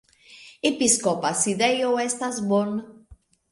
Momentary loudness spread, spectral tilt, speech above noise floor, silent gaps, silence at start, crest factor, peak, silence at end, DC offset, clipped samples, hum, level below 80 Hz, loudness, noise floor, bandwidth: 7 LU; -3 dB/octave; 30 dB; none; 0.3 s; 20 dB; -6 dBFS; 0.35 s; under 0.1%; under 0.1%; none; -62 dBFS; -23 LUFS; -53 dBFS; 11.5 kHz